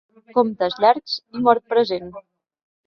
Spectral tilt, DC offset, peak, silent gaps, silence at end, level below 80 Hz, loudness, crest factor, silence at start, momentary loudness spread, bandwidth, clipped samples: -6 dB/octave; under 0.1%; 0 dBFS; none; 0.65 s; -64 dBFS; -20 LUFS; 20 dB; 0.35 s; 10 LU; 6.4 kHz; under 0.1%